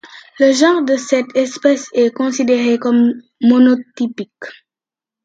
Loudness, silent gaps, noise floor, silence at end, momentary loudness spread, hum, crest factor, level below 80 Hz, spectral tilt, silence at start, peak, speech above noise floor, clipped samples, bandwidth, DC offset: -14 LUFS; none; -89 dBFS; 0.7 s; 11 LU; none; 14 dB; -68 dBFS; -4 dB/octave; 0.05 s; 0 dBFS; 75 dB; under 0.1%; 9 kHz; under 0.1%